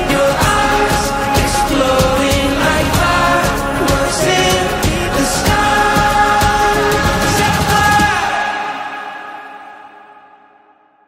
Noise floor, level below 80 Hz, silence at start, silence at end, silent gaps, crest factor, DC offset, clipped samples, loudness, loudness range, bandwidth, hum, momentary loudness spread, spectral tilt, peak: -50 dBFS; -26 dBFS; 0 s; 1.1 s; none; 14 dB; under 0.1%; under 0.1%; -13 LUFS; 4 LU; 16.5 kHz; none; 10 LU; -4 dB/octave; 0 dBFS